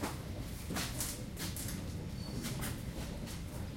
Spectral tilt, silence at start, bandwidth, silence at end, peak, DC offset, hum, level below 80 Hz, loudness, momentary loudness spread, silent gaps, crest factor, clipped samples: -4 dB/octave; 0 s; 16.5 kHz; 0 s; -24 dBFS; under 0.1%; none; -48 dBFS; -41 LUFS; 5 LU; none; 18 dB; under 0.1%